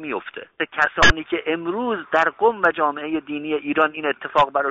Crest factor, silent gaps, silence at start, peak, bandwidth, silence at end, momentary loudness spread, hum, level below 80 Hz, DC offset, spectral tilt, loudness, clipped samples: 18 dB; none; 0 s; -4 dBFS; 8 kHz; 0 s; 11 LU; none; -38 dBFS; under 0.1%; -1.5 dB/octave; -20 LUFS; under 0.1%